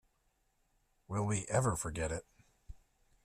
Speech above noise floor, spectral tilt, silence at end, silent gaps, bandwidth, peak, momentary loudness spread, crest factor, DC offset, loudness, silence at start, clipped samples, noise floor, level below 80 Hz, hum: 42 dB; -5.5 dB/octave; 0.5 s; none; 14 kHz; -18 dBFS; 8 LU; 22 dB; under 0.1%; -36 LUFS; 1.1 s; under 0.1%; -77 dBFS; -56 dBFS; none